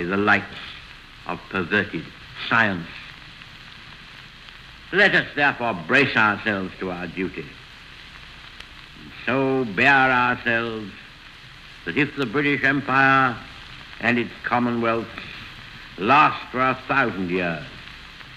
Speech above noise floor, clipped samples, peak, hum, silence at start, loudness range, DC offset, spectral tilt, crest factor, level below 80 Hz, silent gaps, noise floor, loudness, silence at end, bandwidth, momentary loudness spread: 22 dB; under 0.1%; -4 dBFS; none; 0 s; 5 LU; under 0.1%; -6 dB/octave; 18 dB; -52 dBFS; none; -44 dBFS; -21 LUFS; 0 s; 13 kHz; 24 LU